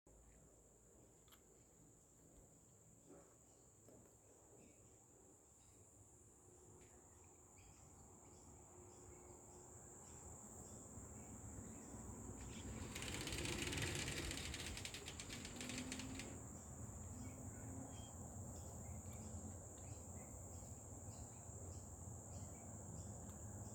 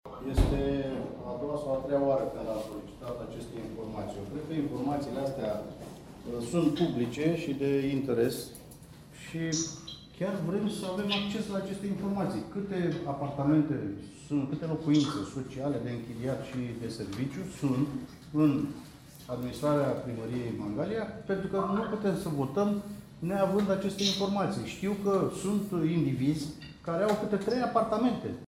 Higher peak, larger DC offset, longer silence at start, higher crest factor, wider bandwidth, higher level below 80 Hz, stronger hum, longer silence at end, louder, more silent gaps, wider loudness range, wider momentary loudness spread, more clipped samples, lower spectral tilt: second, -30 dBFS vs -12 dBFS; neither; about the same, 0.05 s vs 0.05 s; about the same, 24 dB vs 20 dB; first, 19 kHz vs 16 kHz; second, -64 dBFS vs -48 dBFS; neither; about the same, 0 s vs 0.05 s; second, -52 LUFS vs -32 LUFS; neither; first, 19 LU vs 4 LU; first, 20 LU vs 12 LU; neither; second, -3.5 dB/octave vs -6 dB/octave